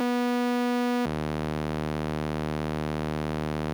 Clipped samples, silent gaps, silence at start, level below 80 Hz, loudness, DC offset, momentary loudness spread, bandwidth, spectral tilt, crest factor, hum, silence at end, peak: under 0.1%; none; 0 s; -44 dBFS; -29 LUFS; under 0.1%; 4 LU; over 20 kHz; -6.5 dB/octave; 12 dB; none; 0 s; -16 dBFS